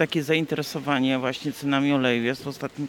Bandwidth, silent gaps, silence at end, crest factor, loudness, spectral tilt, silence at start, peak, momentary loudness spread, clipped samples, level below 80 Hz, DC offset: 17.5 kHz; none; 0 s; 18 dB; -24 LUFS; -5.5 dB/octave; 0 s; -8 dBFS; 7 LU; under 0.1%; -64 dBFS; under 0.1%